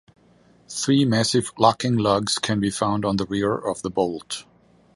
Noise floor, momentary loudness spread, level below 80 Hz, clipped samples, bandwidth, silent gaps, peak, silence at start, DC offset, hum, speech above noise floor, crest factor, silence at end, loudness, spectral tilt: -56 dBFS; 9 LU; -54 dBFS; under 0.1%; 11.5 kHz; none; -2 dBFS; 0.7 s; under 0.1%; none; 34 dB; 20 dB; 0.55 s; -22 LUFS; -5 dB/octave